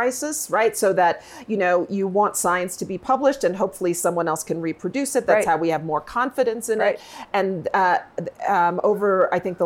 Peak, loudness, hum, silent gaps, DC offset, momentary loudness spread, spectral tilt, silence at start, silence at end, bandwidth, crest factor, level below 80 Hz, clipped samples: -4 dBFS; -22 LUFS; none; none; under 0.1%; 7 LU; -4.5 dB/octave; 0 s; 0 s; 17 kHz; 18 dB; -60 dBFS; under 0.1%